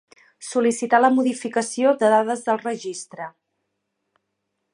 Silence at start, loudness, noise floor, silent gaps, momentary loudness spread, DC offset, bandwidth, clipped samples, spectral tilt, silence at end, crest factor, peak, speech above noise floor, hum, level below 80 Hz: 0.4 s; -20 LUFS; -77 dBFS; none; 18 LU; under 0.1%; 11.5 kHz; under 0.1%; -4 dB/octave; 1.45 s; 20 dB; -2 dBFS; 57 dB; none; -78 dBFS